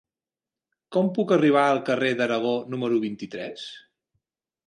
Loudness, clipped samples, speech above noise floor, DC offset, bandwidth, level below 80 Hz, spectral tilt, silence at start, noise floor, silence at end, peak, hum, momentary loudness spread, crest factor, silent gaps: -24 LUFS; under 0.1%; over 67 dB; under 0.1%; 11 kHz; -74 dBFS; -6.5 dB/octave; 0.9 s; under -90 dBFS; 0.9 s; -6 dBFS; none; 15 LU; 18 dB; none